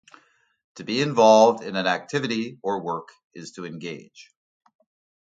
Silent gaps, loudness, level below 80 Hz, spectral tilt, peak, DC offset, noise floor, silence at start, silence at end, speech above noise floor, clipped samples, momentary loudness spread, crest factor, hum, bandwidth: 3.24-3.30 s; -21 LUFS; -72 dBFS; -4.5 dB/octave; -4 dBFS; under 0.1%; -56 dBFS; 0.75 s; 1 s; 33 dB; under 0.1%; 23 LU; 20 dB; none; 9 kHz